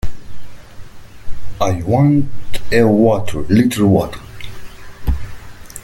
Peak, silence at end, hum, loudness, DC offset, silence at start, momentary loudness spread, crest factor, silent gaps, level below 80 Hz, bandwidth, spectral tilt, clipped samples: 0 dBFS; 0.05 s; none; -15 LUFS; under 0.1%; 0.05 s; 22 LU; 14 dB; none; -30 dBFS; 17 kHz; -7 dB/octave; under 0.1%